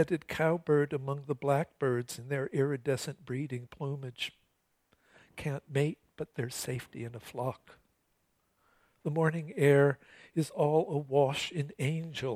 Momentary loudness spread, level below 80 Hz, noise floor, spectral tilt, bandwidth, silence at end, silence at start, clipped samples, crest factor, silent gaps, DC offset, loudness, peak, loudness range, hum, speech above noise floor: 12 LU; -68 dBFS; -76 dBFS; -6 dB/octave; 15.5 kHz; 0 s; 0 s; under 0.1%; 20 dB; none; under 0.1%; -32 LUFS; -12 dBFS; 8 LU; none; 44 dB